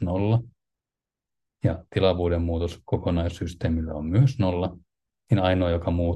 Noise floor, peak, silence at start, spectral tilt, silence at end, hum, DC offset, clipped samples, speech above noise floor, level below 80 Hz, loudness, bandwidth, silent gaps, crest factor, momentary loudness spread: -89 dBFS; -8 dBFS; 0 s; -8 dB/octave; 0 s; none; under 0.1%; under 0.1%; 65 dB; -44 dBFS; -25 LUFS; 8.6 kHz; none; 16 dB; 7 LU